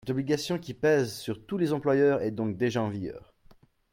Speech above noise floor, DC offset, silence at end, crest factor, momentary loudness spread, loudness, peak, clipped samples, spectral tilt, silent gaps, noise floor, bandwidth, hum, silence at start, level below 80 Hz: 31 dB; under 0.1%; 0.75 s; 16 dB; 12 LU; -28 LUFS; -12 dBFS; under 0.1%; -6 dB/octave; none; -58 dBFS; 16.5 kHz; none; 0.05 s; -62 dBFS